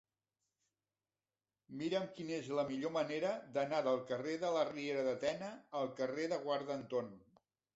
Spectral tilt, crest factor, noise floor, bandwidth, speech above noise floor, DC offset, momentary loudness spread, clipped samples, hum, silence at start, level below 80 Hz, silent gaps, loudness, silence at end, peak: -4 dB/octave; 18 dB; under -90 dBFS; 8 kHz; over 51 dB; under 0.1%; 7 LU; under 0.1%; none; 1.7 s; -80 dBFS; none; -39 LUFS; 0.55 s; -22 dBFS